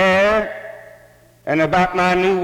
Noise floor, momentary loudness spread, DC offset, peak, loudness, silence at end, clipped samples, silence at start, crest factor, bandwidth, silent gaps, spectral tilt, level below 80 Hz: -49 dBFS; 18 LU; under 0.1%; -2 dBFS; -17 LUFS; 0 s; under 0.1%; 0 s; 16 dB; 16 kHz; none; -5.5 dB/octave; -44 dBFS